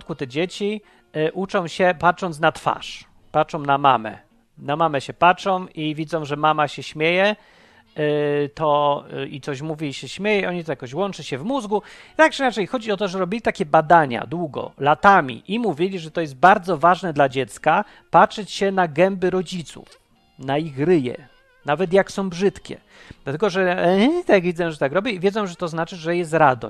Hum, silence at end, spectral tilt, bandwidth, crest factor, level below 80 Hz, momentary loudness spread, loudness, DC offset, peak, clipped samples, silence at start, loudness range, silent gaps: none; 0 s; -5.5 dB/octave; 12.5 kHz; 20 dB; -54 dBFS; 12 LU; -20 LUFS; under 0.1%; 0 dBFS; under 0.1%; 0 s; 5 LU; none